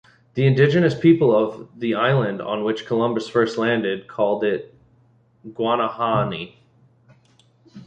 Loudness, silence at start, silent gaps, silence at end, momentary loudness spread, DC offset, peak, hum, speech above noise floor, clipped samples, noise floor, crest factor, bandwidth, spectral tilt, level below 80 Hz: -20 LUFS; 0.35 s; none; 0 s; 11 LU; under 0.1%; -2 dBFS; none; 38 dB; under 0.1%; -57 dBFS; 18 dB; 8.6 kHz; -7.5 dB/octave; -58 dBFS